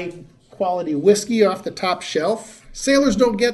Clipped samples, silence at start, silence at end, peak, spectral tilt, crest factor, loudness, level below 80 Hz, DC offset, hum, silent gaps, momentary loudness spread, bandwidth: under 0.1%; 0 s; 0 s; -2 dBFS; -4 dB/octave; 18 dB; -19 LUFS; -50 dBFS; under 0.1%; none; none; 9 LU; 12.5 kHz